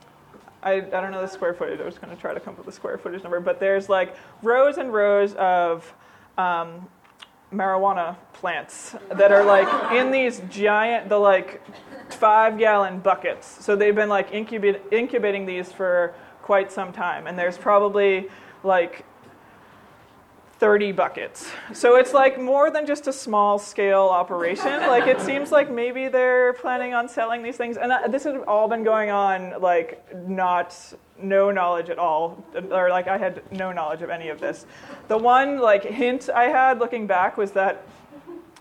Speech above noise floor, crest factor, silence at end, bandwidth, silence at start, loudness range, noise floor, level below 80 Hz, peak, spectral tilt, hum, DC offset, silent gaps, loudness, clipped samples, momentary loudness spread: 30 dB; 18 dB; 0.2 s; 12 kHz; 0.65 s; 6 LU; -52 dBFS; -68 dBFS; -4 dBFS; -5 dB/octave; none; under 0.1%; none; -21 LUFS; under 0.1%; 14 LU